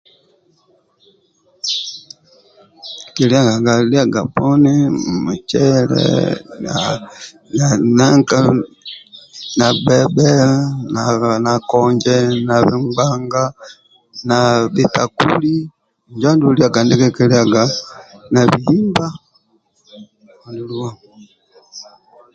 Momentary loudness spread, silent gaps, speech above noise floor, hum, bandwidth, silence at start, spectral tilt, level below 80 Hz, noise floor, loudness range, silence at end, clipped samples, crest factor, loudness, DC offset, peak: 19 LU; none; 45 dB; none; 8.8 kHz; 1.65 s; -5.5 dB/octave; -50 dBFS; -59 dBFS; 5 LU; 0.5 s; under 0.1%; 16 dB; -14 LUFS; under 0.1%; 0 dBFS